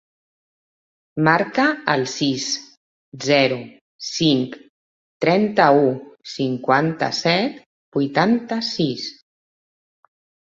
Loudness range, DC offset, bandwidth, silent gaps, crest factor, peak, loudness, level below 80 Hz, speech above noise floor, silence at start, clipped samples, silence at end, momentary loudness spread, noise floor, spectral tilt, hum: 3 LU; under 0.1%; 8 kHz; 2.77-3.12 s, 3.81-3.99 s, 4.69-5.20 s, 7.66-7.92 s; 20 dB; -2 dBFS; -20 LUFS; -64 dBFS; over 71 dB; 1.15 s; under 0.1%; 1.4 s; 13 LU; under -90 dBFS; -4.5 dB/octave; none